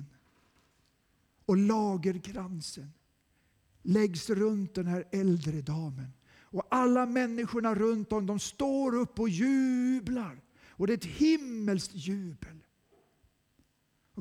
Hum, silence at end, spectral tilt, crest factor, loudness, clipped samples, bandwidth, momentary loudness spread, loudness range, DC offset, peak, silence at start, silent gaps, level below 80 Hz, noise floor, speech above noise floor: none; 0 s; -6.5 dB/octave; 16 dB; -31 LUFS; under 0.1%; 14 kHz; 13 LU; 4 LU; under 0.1%; -16 dBFS; 0 s; none; -62 dBFS; -73 dBFS; 43 dB